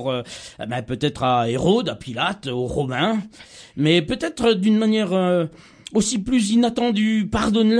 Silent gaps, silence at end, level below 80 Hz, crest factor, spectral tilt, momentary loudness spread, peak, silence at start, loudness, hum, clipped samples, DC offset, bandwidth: none; 0 s; -46 dBFS; 16 dB; -5 dB/octave; 11 LU; -4 dBFS; 0 s; -21 LUFS; none; under 0.1%; under 0.1%; 10.5 kHz